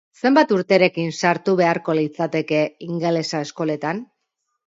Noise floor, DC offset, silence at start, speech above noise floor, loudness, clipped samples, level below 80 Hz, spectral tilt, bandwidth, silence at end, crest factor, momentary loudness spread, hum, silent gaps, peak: -76 dBFS; under 0.1%; 0.25 s; 56 dB; -20 LUFS; under 0.1%; -68 dBFS; -5.5 dB/octave; 8 kHz; 0.65 s; 18 dB; 8 LU; none; none; -2 dBFS